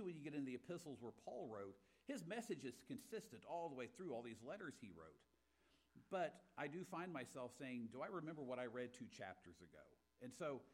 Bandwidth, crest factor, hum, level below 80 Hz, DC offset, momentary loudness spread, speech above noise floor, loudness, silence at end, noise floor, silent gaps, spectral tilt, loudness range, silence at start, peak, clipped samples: 16 kHz; 18 dB; none; -86 dBFS; under 0.1%; 11 LU; 28 dB; -52 LUFS; 0 s; -80 dBFS; none; -5.5 dB/octave; 3 LU; 0 s; -34 dBFS; under 0.1%